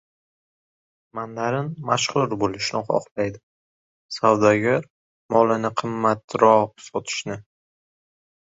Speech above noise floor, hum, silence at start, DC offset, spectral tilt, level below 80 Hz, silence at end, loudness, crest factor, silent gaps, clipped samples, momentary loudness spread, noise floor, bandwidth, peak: over 69 dB; none; 1.15 s; under 0.1%; -5 dB/octave; -60 dBFS; 1.05 s; -22 LUFS; 22 dB; 3.11-3.16 s, 3.43-4.09 s, 4.90-5.29 s, 6.24-6.28 s; under 0.1%; 15 LU; under -90 dBFS; 8 kHz; -2 dBFS